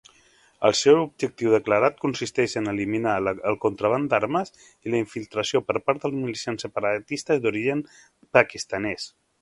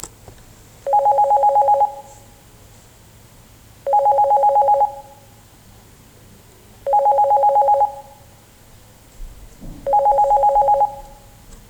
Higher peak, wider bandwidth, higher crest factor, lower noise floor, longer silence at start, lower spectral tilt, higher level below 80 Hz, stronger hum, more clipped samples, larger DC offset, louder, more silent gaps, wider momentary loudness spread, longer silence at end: first, 0 dBFS vs -8 dBFS; second, 11.5 kHz vs 19 kHz; first, 24 dB vs 12 dB; first, -58 dBFS vs -46 dBFS; first, 0.6 s vs 0.05 s; about the same, -4.5 dB/octave vs -4.5 dB/octave; second, -60 dBFS vs -46 dBFS; neither; neither; neither; second, -24 LUFS vs -16 LUFS; neither; second, 9 LU vs 16 LU; first, 0.35 s vs 0.15 s